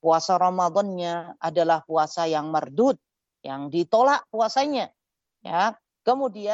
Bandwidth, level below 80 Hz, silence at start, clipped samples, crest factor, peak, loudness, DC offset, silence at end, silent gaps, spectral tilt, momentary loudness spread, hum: 8 kHz; -80 dBFS; 0.05 s; under 0.1%; 16 dB; -8 dBFS; -24 LUFS; under 0.1%; 0 s; none; -5 dB/octave; 11 LU; none